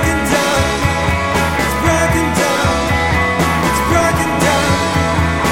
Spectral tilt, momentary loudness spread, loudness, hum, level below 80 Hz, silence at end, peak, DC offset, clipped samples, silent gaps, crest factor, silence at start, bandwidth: -4.5 dB/octave; 2 LU; -14 LUFS; none; -26 dBFS; 0 s; 0 dBFS; under 0.1%; under 0.1%; none; 14 dB; 0 s; 17 kHz